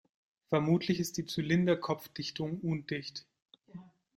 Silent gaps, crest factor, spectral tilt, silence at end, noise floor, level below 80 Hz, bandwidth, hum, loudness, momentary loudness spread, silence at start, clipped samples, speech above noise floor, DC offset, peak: 3.42-3.46 s; 18 dB; -6 dB/octave; 0.35 s; -53 dBFS; -68 dBFS; 16 kHz; none; -33 LUFS; 22 LU; 0.5 s; under 0.1%; 20 dB; under 0.1%; -16 dBFS